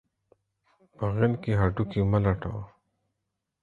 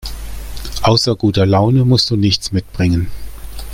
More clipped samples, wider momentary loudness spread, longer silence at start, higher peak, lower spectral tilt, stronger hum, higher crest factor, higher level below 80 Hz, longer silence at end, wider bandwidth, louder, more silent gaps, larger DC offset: neither; second, 12 LU vs 18 LU; first, 1 s vs 0 s; second, -8 dBFS vs 0 dBFS; first, -10 dB/octave vs -6 dB/octave; neither; first, 20 dB vs 14 dB; second, -44 dBFS vs -30 dBFS; first, 0.95 s vs 0 s; second, 4.5 kHz vs 16.5 kHz; second, -27 LUFS vs -14 LUFS; neither; neither